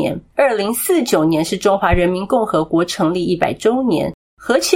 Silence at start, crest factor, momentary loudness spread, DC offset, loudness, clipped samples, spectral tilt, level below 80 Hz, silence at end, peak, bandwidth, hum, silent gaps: 0 s; 16 dB; 4 LU; under 0.1%; -17 LUFS; under 0.1%; -5 dB/octave; -34 dBFS; 0 s; 0 dBFS; 16.5 kHz; none; 4.14-4.37 s